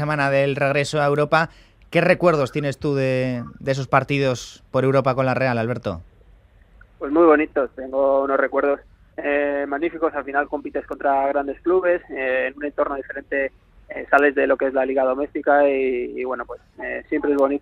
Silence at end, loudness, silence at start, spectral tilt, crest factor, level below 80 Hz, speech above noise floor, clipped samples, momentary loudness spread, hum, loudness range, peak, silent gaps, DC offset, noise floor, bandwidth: 0 s; -21 LUFS; 0 s; -6.5 dB/octave; 20 dB; -52 dBFS; 31 dB; under 0.1%; 11 LU; none; 2 LU; 0 dBFS; none; under 0.1%; -51 dBFS; 11.5 kHz